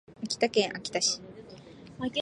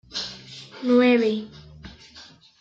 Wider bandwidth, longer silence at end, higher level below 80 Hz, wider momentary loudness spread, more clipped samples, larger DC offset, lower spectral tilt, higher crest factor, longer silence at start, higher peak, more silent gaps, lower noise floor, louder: first, 11 kHz vs 7.6 kHz; second, 0 s vs 0.4 s; second, -66 dBFS vs -58 dBFS; second, 22 LU vs 26 LU; neither; neither; second, -2 dB/octave vs -5 dB/octave; first, 22 dB vs 16 dB; about the same, 0.1 s vs 0.15 s; about the same, -10 dBFS vs -8 dBFS; neither; about the same, -49 dBFS vs -49 dBFS; second, -29 LUFS vs -22 LUFS